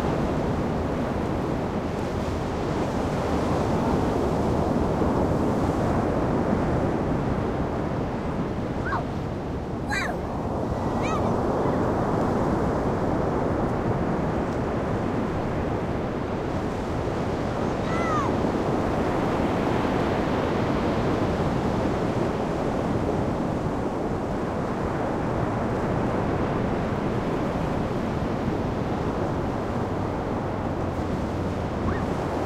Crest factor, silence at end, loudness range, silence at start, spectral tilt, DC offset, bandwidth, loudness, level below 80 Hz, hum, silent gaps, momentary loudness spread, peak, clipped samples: 14 dB; 0 s; 3 LU; 0 s; -7.5 dB/octave; under 0.1%; 15 kHz; -26 LUFS; -38 dBFS; none; none; 4 LU; -10 dBFS; under 0.1%